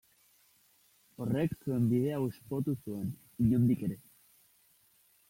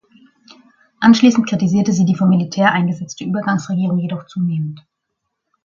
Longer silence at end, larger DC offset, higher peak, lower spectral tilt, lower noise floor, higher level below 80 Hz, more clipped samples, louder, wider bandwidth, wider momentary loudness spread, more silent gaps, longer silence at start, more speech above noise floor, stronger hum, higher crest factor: first, 1.3 s vs 0.85 s; neither; second, -18 dBFS vs 0 dBFS; first, -9 dB/octave vs -6 dB/octave; second, -67 dBFS vs -75 dBFS; about the same, -60 dBFS vs -58 dBFS; neither; second, -33 LUFS vs -16 LUFS; first, 16.5 kHz vs 7.4 kHz; about the same, 11 LU vs 11 LU; neither; first, 1.2 s vs 1 s; second, 36 dB vs 60 dB; neither; about the same, 16 dB vs 16 dB